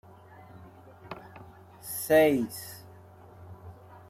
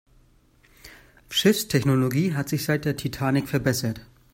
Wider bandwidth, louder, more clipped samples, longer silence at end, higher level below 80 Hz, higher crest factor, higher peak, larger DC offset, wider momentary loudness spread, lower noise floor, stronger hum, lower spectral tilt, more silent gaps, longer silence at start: about the same, 16 kHz vs 16.5 kHz; about the same, -26 LUFS vs -24 LUFS; neither; about the same, 0.4 s vs 0.3 s; second, -66 dBFS vs -54 dBFS; about the same, 20 dB vs 20 dB; second, -10 dBFS vs -6 dBFS; neither; first, 29 LU vs 7 LU; second, -51 dBFS vs -58 dBFS; neither; about the same, -5 dB/octave vs -5 dB/octave; neither; second, 0.55 s vs 0.85 s